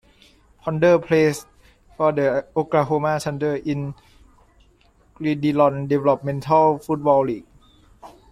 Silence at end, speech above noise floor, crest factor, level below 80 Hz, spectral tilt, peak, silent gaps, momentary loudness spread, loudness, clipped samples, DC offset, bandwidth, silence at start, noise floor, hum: 0.2 s; 37 dB; 18 dB; -54 dBFS; -7 dB/octave; -4 dBFS; none; 11 LU; -20 LUFS; under 0.1%; under 0.1%; 15 kHz; 0.65 s; -56 dBFS; none